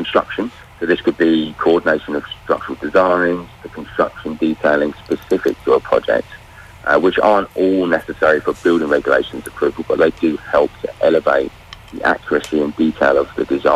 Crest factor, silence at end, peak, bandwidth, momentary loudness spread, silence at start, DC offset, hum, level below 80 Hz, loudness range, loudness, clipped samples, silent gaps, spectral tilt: 14 dB; 0 s; -2 dBFS; 14 kHz; 10 LU; 0 s; under 0.1%; none; -46 dBFS; 2 LU; -17 LUFS; under 0.1%; none; -6 dB/octave